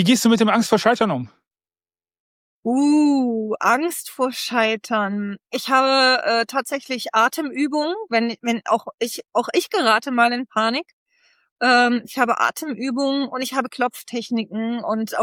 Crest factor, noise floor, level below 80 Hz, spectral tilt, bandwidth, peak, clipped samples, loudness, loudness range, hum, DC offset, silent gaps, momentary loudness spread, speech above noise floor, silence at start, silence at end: 16 dB; under -90 dBFS; -72 dBFS; -4 dB/octave; 17.5 kHz; -4 dBFS; under 0.1%; -20 LUFS; 2 LU; none; under 0.1%; 2.20-2.63 s, 10.93-11.06 s, 11.51-11.56 s; 10 LU; over 70 dB; 0 s; 0 s